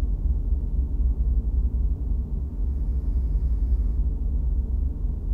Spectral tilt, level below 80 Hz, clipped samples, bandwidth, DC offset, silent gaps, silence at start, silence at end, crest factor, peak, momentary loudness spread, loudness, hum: -11.5 dB/octave; -24 dBFS; under 0.1%; 1.3 kHz; under 0.1%; none; 0 s; 0 s; 10 dB; -14 dBFS; 3 LU; -27 LUFS; none